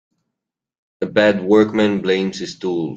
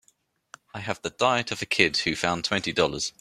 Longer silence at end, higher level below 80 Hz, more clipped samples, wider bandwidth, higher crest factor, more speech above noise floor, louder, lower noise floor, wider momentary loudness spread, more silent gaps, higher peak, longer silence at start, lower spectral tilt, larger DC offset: about the same, 0 s vs 0.1 s; about the same, -58 dBFS vs -58 dBFS; neither; second, 8 kHz vs 15 kHz; second, 16 dB vs 24 dB; first, 65 dB vs 41 dB; first, -17 LUFS vs -25 LUFS; first, -82 dBFS vs -67 dBFS; about the same, 11 LU vs 11 LU; neither; about the same, -2 dBFS vs -2 dBFS; first, 1 s vs 0.75 s; first, -6 dB/octave vs -3 dB/octave; neither